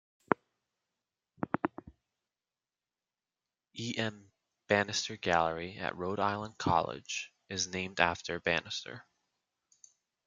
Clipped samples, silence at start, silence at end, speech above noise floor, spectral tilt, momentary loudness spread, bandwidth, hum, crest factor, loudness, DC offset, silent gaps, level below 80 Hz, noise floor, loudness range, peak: under 0.1%; 0.3 s; 1.25 s; over 57 dB; -3.5 dB/octave; 10 LU; 10 kHz; none; 30 dB; -34 LUFS; under 0.1%; none; -68 dBFS; under -90 dBFS; 10 LU; -6 dBFS